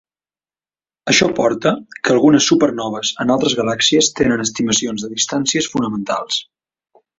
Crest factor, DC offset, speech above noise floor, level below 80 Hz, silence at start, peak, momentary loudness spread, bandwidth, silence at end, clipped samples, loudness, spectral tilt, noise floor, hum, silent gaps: 16 dB; under 0.1%; over 74 dB; -52 dBFS; 1.05 s; 0 dBFS; 9 LU; 8 kHz; 0.75 s; under 0.1%; -16 LUFS; -3 dB/octave; under -90 dBFS; none; none